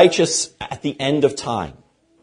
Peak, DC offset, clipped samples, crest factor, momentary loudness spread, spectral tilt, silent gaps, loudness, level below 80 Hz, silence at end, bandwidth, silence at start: 0 dBFS; under 0.1%; under 0.1%; 20 dB; 10 LU; -4 dB/octave; none; -20 LUFS; -52 dBFS; 0.5 s; 10.5 kHz; 0 s